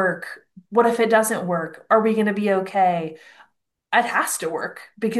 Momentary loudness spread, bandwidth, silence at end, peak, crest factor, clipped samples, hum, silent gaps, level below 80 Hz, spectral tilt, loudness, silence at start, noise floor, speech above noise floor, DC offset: 13 LU; 12.5 kHz; 0 s; -4 dBFS; 18 dB; under 0.1%; none; none; -72 dBFS; -4.5 dB/octave; -21 LUFS; 0 s; -63 dBFS; 42 dB; under 0.1%